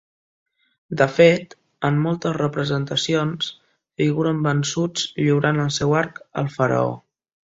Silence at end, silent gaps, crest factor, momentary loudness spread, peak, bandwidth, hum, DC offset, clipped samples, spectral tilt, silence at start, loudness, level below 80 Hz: 0.6 s; none; 20 dB; 11 LU; -2 dBFS; 8 kHz; none; under 0.1%; under 0.1%; -5.5 dB/octave; 0.9 s; -21 LUFS; -56 dBFS